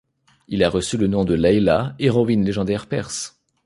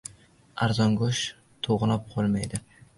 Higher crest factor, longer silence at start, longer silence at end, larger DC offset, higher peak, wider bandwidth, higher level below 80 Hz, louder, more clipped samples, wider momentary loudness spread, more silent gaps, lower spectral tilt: about the same, 18 dB vs 14 dB; about the same, 0.5 s vs 0.55 s; about the same, 0.4 s vs 0.4 s; neither; first, -2 dBFS vs -12 dBFS; about the same, 11.5 kHz vs 11.5 kHz; first, -42 dBFS vs -52 dBFS; first, -20 LUFS vs -27 LUFS; neither; about the same, 11 LU vs 13 LU; neither; about the same, -6 dB/octave vs -5.5 dB/octave